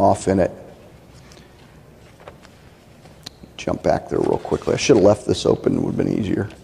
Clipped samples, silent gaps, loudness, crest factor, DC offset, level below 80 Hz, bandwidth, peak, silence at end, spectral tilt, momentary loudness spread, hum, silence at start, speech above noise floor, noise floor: under 0.1%; none; -19 LUFS; 20 dB; under 0.1%; -46 dBFS; 13.5 kHz; -2 dBFS; 0.1 s; -6 dB/octave; 23 LU; none; 0 s; 28 dB; -47 dBFS